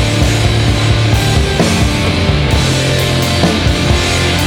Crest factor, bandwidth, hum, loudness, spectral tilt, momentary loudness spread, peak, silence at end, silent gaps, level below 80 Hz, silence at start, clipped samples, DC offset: 12 dB; 18.5 kHz; none; -12 LUFS; -5 dB/octave; 1 LU; 0 dBFS; 0 s; none; -20 dBFS; 0 s; under 0.1%; under 0.1%